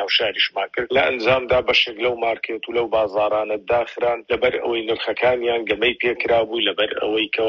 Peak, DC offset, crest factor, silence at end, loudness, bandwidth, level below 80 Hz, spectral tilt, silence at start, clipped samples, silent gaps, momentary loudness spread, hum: -4 dBFS; under 0.1%; 16 dB; 0 s; -20 LUFS; 6.8 kHz; -50 dBFS; -5 dB/octave; 0 s; under 0.1%; none; 6 LU; none